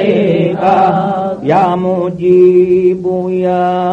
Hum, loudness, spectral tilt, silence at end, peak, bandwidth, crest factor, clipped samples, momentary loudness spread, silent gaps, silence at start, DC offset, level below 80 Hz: none; -11 LUFS; -9 dB/octave; 0 s; 0 dBFS; 5.6 kHz; 10 dB; under 0.1%; 8 LU; none; 0 s; under 0.1%; -50 dBFS